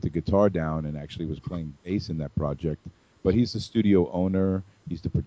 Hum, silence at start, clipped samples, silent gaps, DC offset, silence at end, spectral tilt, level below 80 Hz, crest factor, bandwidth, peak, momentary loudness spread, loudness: none; 0.05 s; under 0.1%; none; under 0.1%; 0 s; -8.5 dB/octave; -42 dBFS; 18 dB; 8 kHz; -8 dBFS; 12 LU; -27 LUFS